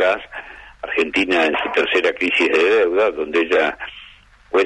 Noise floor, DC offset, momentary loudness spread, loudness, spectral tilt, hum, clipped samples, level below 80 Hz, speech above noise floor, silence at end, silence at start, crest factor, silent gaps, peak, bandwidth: -46 dBFS; under 0.1%; 18 LU; -17 LUFS; -3.5 dB/octave; none; under 0.1%; -52 dBFS; 28 dB; 0 s; 0 s; 14 dB; none; -4 dBFS; 10.5 kHz